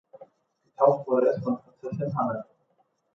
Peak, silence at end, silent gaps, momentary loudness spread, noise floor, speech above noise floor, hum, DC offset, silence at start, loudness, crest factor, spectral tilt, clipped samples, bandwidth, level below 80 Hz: -6 dBFS; 0.7 s; none; 11 LU; -71 dBFS; 46 dB; none; under 0.1%; 0.2 s; -26 LUFS; 22 dB; -10 dB/octave; under 0.1%; 6.4 kHz; -68 dBFS